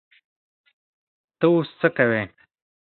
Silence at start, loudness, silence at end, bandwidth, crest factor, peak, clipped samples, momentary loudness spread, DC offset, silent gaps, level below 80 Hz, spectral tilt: 1.4 s; -21 LUFS; 0.6 s; 4.4 kHz; 22 dB; -2 dBFS; under 0.1%; 6 LU; under 0.1%; none; -66 dBFS; -11 dB/octave